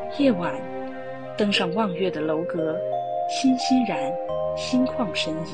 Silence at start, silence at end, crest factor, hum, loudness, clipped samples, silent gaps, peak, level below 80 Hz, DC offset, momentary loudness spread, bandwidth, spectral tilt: 0 s; 0 s; 16 dB; none; -24 LUFS; under 0.1%; none; -8 dBFS; -56 dBFS; 0.5%; 10 LU; 9.6 kHz; -5 dB/octave